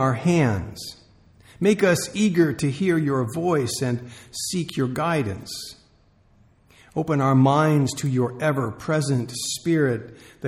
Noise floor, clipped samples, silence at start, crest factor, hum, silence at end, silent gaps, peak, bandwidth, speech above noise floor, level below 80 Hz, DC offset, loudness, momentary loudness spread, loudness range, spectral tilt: -58 dBFS; under 0.1%; 0 s; 16 dB; none; 0 s; none; -6 dBFS; 15 kHz; 36 dB; -54 dBFS; under 0.1%; -22 LUFS; 14 LU; 5 LU; -6 dB/octave